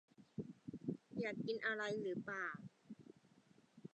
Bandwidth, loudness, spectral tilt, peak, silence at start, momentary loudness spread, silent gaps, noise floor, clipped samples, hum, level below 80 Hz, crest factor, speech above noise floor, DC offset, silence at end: 9 kHz; -45 LUFS; -6 dB/octave; -28 dBFS; 0.2 s; 19 LU; none; -71 dBFS; under 0.1%; none; -84 dBFS; 20 dB; 27 dB; under 0.1%; 0.1 s